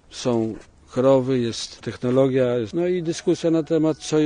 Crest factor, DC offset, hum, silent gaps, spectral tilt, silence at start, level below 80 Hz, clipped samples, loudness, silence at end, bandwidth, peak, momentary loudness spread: 16 dB; under 0.1%; none; none; -6 dB/octave; 0.1 s; -54 dBFS; under 0.1%; -22 LUFS; 0 s; 10 kHz; -4 dBFS; 11 LU